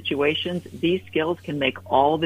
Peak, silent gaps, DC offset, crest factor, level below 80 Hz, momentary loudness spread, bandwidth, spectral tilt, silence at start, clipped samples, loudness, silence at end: -6 dBFS; none; under 0.1%; 18 dB; -58 dBFS; 6 LU; 15.5 kHz; -6.5 dB/octave; 0 s; under 0.1%; -24 LUFS; 0 s